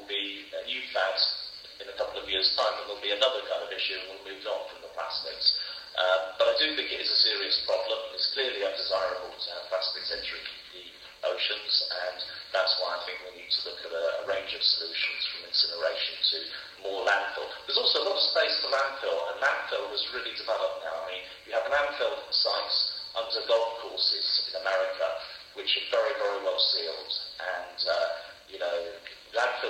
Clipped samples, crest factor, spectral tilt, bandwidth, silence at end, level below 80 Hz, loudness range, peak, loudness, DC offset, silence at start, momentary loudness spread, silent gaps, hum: under 0.1%; 22 dB; -1 dB/octave; 15.5 kHz; 0 s; -68 dBFS; 4 LU; -8 dBFS; -28 LUFS; under 0.1%; 0 s; 12 LU; none; none